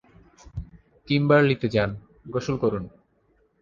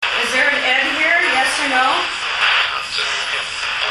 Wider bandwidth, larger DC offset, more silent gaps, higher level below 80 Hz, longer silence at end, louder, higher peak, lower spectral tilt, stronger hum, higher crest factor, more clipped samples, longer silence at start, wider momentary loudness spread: second, 7.4 kHz vs 13.5 kHz; neither; neither; about the same, -48 dBFS vs -52 dBFS; first, 0.75 s vs 0 s; second, -23 LUFS vs -15 LUFS; second, -6 dBFS vs -2 dBFS; first, -7.5 dB/octave vs 0 dB/octave; neither; about the same, 18 dB vs 16 dB; neither; first, 0.45 s vs 0 s; first, 21 LU vs 6 LU